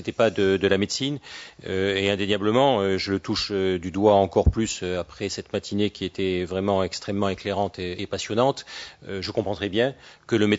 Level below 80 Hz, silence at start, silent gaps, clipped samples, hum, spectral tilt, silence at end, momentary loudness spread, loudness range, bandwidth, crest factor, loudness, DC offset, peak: -42 dBFS; 0 s; none; under 0.1%; none; -5 dB/octave; 0 s; 11 LU; 4 LU; 8 kHz; 20 dB; -24 LUFS; under 0.1%; -4 dBFS